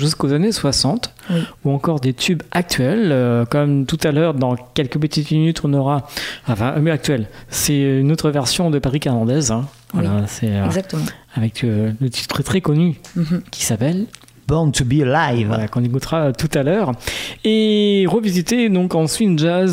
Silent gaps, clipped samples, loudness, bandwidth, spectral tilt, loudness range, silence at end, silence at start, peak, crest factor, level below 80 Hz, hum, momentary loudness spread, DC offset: none; under 0.1%; -18 LUFS; 16 kHz; -5.5 dB/octave; 3 LU; 0 s; 0 s; -4 dBFS; 14 dB; -42 dBFS; none; 6 LU; under 0.1%